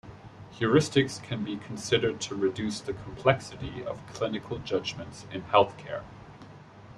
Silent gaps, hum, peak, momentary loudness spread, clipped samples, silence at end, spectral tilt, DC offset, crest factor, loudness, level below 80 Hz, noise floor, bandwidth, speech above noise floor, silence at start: none; none; -4 dBFS; 23 LU; under 0.1%; 0 s; -5 dB/octave; under 0.1%; 24 dB; -29 LUFS; -56 dBFS; -49 dBFS; 12.5 kHz; 20 dB; 0.05 s